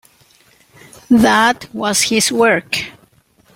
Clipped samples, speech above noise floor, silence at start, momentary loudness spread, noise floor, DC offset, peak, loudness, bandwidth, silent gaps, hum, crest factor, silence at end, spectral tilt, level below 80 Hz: under 0.1%; 39 dB; 1.1 s; 10 LU; -53 dBFS; under 0.1%; 0 dBFS; -14 LUFS; 16.5 kHz; none; none; 16 dB; 0.65 s; -2.5 dB/octave; -50 dBFS